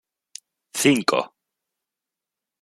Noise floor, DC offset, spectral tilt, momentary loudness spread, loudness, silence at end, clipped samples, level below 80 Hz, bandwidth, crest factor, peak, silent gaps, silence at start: -87 dBFS; under 0.1%; -3.5 dB/octave; 24 LU; -21 LUFS; 1.35 s; under 0.1%; -70 dBFS; 16 kHz; 22 dB; -4 dBFS; none; 0.75 s